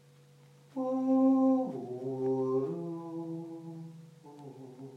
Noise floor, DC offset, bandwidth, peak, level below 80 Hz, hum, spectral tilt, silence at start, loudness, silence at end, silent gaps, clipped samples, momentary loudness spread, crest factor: -59 dBFS; under 0.1%; 6.2 kHz; -16 dBFS; -88 dBFS; none; -9.5 dB/octave; 0.75 s; -31 LUFS; 0 s; none; under 0.1%; 23 LU; 16 dB